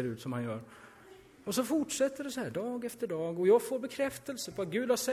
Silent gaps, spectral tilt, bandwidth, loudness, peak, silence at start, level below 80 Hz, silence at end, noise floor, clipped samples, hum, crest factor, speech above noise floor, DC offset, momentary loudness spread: none; -4.5 dB/octave; 16 kHz; -33 LUFS; -16 dBFS; 0 s; -70 dBFS; 0 s; -56 dBFS; under 0.1%; none; 18 dB; 23 dB; under 0.1%; 12 LU